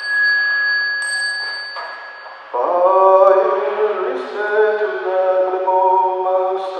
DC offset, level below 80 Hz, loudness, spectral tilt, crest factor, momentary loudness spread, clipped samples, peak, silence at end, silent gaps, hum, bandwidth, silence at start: under 0.1%; -78 dBFS; -16 LUFS; -1.5 dB/octave; 16 dB; 14 LU; under 0.1%; 0 dBFS; 0 s; none; none; 9.2 kHz; 0 s